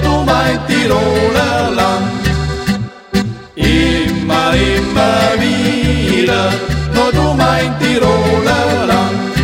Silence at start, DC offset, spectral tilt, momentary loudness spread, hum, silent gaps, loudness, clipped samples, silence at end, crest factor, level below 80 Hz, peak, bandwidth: 0 s; under 0.1%; -5.5 dB/octave; 5 LU; none; none; -13 LUFS; under 0.1%; 0 s; 12 dB; -24 dBFS; 0 dBFS; 16.5 kHz